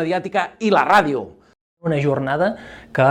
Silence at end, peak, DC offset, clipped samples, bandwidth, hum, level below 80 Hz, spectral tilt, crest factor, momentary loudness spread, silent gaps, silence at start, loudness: 0 s; -2 dBFS; under 0.1%; under 0.1%; 17.5 kHz; none; -54 dBFS; -6.5 dB/octave; 16 dB; 13 LU; 1.61-1.77 s; 0 s; -19 LUFS